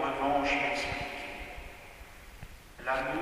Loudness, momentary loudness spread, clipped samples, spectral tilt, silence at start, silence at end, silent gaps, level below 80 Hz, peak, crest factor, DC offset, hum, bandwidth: -32 LUFS; 22 LU; under 0.1%; -4 dB/octave; 0 s; 0 s; none; -50 dBFS; -16 dBFS; 18 dB; under 0.1%; none; 15.5 kHz